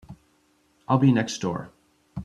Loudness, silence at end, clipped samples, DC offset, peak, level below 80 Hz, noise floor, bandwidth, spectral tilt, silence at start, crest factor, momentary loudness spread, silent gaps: -24 LUFS; 0 s; under 0.1%; under 0.1%; -4 dBFS; -58 dBFS; -65 dBFS; 10.5 kHz; -6.5 dB/octave; 0.1 s; 22 dB; 25 LU; none